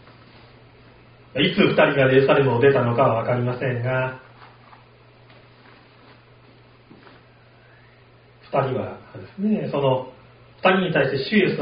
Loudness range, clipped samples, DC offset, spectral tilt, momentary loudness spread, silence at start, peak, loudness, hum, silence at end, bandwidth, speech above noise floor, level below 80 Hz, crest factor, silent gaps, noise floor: 13 LU; under 0.1%; under 0.1%; -4.5 dB/octave; 13 LU; 1.35 s; -4 dBFS; -20 LUFS; none; 0 s; 5.2 kHz; 32 dB; -56 dBFS; 20 dB; none; -51 dBFS